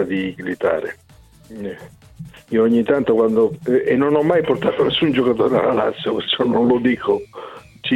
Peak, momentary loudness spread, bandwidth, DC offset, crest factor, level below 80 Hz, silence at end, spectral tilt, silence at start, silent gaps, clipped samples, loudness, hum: -4 dBFS; 15 LU; 11.5 kHz; under 0.1%; 14 dB; -52 dBFS; 0 s; -7 dB/octave; 0 s; none; under 0.1%; -18 LUFS; none